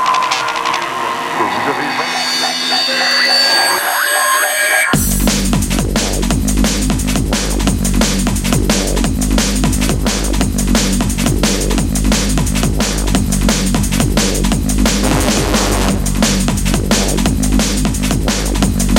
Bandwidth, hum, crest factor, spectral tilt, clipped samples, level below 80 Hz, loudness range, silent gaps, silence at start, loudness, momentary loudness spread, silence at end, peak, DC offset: 17 kHz; none; 14 dB; -3.5 dB/octave; under 0.1%; -20 dBFS; 3 LU; none; 0 s; -14 LUFS; 5 LU; 0 s; 0 dBFS; under 0.1%